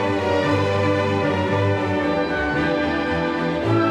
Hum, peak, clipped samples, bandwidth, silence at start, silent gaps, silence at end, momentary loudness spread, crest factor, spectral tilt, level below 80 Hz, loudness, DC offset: none; -8 dBFS; under 0.1%; 10.5 kHz; 0 s; none; 0 s; 2 LU; 12 dB; -7 dB/octave; -44 dBFS; -21 LUFS; 0.1%